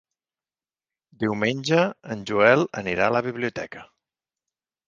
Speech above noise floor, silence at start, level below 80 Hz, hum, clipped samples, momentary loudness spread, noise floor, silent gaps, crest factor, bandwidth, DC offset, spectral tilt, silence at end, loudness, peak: over 67 dB; 1.2 s; -60 dBFS; none; under 0.1%; 16 LU; under -90 dBFS; none; 24 dB; 7.6 kHz; under 0.1%; -5.5 dB/octave; 1.05 s; -23 LUFS; -2 dBFS